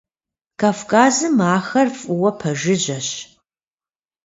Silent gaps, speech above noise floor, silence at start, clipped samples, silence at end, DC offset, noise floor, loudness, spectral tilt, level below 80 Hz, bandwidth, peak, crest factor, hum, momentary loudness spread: none; over 72 dB; 0.6 s; under 0.1%; 1 s; under 0.1%; under -90 dBFS; -18 LUFS; -4.5 dB/octave; -62 dBFS; 8 kHz; 0 dBFS; 20 dB; none; 8 LU